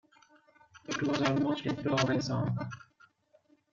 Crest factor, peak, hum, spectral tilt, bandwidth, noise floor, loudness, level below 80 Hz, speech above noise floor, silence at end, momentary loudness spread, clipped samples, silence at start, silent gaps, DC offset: 20 dB; -14 dBFS; none; -5.5 dB/octave; 7.6 kHz; -67 dBFS; -32 LUFS; -66 dBFS; 36 dB; 0.95 s; 13 LU; under 0.1%; 0.75 s; none; under 0.1%